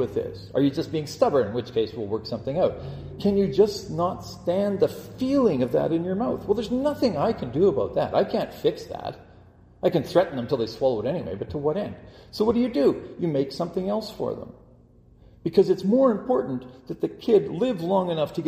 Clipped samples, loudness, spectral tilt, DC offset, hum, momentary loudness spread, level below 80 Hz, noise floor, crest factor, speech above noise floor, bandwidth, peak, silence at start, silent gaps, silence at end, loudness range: under 0.1%; -25 LUFS; -7 dB/octave; under 0.1%; none; 10 LU; -52 dBFS; -53 dBFS; 20 dB; 29 dB; 15.5 kHz; -6 dBFS; 0 s; none; 0 s; 3 LU